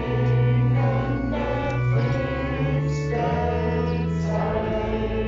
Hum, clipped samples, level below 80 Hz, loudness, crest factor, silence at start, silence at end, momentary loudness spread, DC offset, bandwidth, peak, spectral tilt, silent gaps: none; under 0.1%; -36 dBFS; -23 LUFS; 12 dB; 0 s; 0 s; 5 LU; under 0.1%; 7.4 kHz; -10 dBFS; -7.5 dB/octave; none